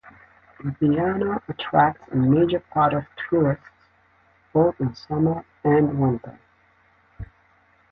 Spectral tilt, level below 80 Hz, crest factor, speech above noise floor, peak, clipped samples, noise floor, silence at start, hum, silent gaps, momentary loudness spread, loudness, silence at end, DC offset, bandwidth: -10 dB/octave; -50 dBFS; 18 dB; 39 dB; -6 dBFS; under 0.1%; -60 dBFS; 0.05 s; none; none; 14 LU; -22 LUFS; 0.65 s; under 0.1%; 6 kHz